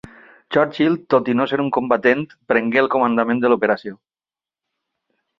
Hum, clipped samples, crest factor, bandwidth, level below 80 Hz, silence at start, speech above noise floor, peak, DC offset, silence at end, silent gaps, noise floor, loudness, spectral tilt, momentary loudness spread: none; under 0.1%; 18 dB; 6.2 kHz; -62 dBFS; 0.5 s; over 72 dB; -2 dBFS; under 0.1%; 1.45 s; none; under -90 dBFS; -18 LUFS; -7.5 dB/octave; 5 LU